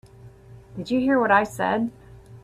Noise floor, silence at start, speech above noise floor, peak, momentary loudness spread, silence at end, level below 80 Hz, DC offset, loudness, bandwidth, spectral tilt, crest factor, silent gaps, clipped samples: -47 dBFS; 0.25 s; 25 dB; -4 dBFS; 16 LU; 0.05 s; -54 dBFS; under 0.1%; -22 LUFS; 14 kHz; -6 dB/octave; 20 dB; none; under 0.1%